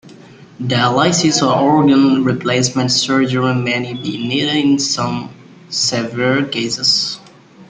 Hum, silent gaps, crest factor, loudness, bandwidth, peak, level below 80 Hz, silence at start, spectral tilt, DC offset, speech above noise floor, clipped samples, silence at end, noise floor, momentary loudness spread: none; none; 14 dB; -15 LUFS; 9.6 kHz; -2 dBFS; -54 dBFS; 0.05 s; -4 dB/octave; under 0.1%; 25 dB; under 0.1%; 0.05 s; -40 dBFS; 10 LU